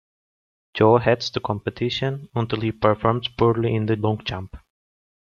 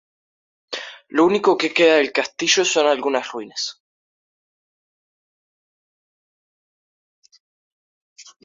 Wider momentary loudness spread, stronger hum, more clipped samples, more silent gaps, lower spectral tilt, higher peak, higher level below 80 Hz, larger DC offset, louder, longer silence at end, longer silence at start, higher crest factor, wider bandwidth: second, 10 LU vs 16 LU; neither; neither; second, none vs 3.80-7.22 s, 7.40-8.16 s; first, -7 dB/octave vs -2 dB/octave; about the same, -4 dBFS vs -2 dBFS; first, -50 dBFS vs -70 dBFS; neither; second, -22 LUFS vs -18 LUFS; first, 0.7 s vs 0.2 s; about the same, 0.75 s vs 0.7 s; about the same, 20 dB vs 20 dB; about the same, 7.2 kHz vs 7.6 kHz